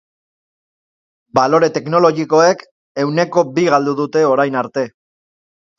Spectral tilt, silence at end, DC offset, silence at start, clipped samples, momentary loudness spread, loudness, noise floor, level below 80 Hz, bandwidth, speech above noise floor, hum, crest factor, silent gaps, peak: -5.5 dB/octave; 0.9 s; under 0.1%; 1.35 s; under 0.1%; 9 LU; -15 LUFS; under -90 dBFS; -62 dBFS; 7.4 kHz; over 76 dB; none; 16 dB; 2.71-2.95 s; 0 dBFS